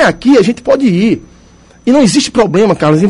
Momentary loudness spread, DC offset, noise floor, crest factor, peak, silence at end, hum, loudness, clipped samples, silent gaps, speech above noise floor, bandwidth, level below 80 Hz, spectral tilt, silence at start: 5 LU; under 0.1%; -41 dBFS; 10 dB; 0 dBFS; 0 s; none; -10 LUFS; under 0.1%; none; 32 dB; 11.5 kHz; -40 dBFS; -5.5 dB/octave; 0 s